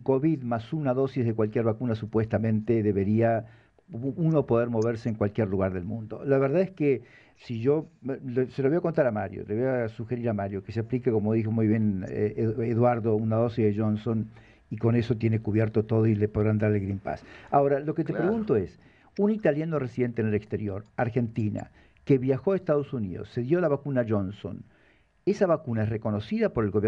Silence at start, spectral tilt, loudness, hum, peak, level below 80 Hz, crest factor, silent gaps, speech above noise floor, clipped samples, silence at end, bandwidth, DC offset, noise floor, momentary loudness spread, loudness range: 0 s; -9.5 dB/octave; -27 LUFS; none; -10 dBFS; -56 dBFS; 18 dB; none; 36 dB; under 0.1%; 0 s; 7.2 kHz; under 0.1%; -62 dBFS; 9 LU; 2 LU